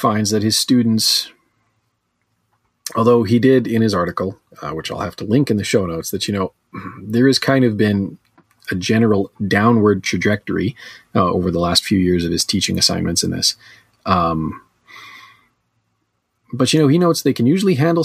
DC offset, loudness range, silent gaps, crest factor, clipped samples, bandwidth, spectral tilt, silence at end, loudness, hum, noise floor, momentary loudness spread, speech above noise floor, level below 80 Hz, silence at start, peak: under 0.1%; 4 LU; none; 16 dB; under 0.1%; 15.5 kHz; -4.5 dB/octave; 0 s; -17 LUFS; none; -70 dBFS; 14 LU; 53 dB; -48 dBFS; 0 s; -2 dBFS